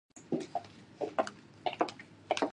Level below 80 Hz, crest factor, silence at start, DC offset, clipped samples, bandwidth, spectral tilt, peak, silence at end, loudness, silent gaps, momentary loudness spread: -76 dBFS; 24 dB; 0.15 s; under 0.1%; under 0.1%; 11 kHz; -4.5 dB/octave; -14 dBFS; 0 s; -38 LUFS; none; 7 LU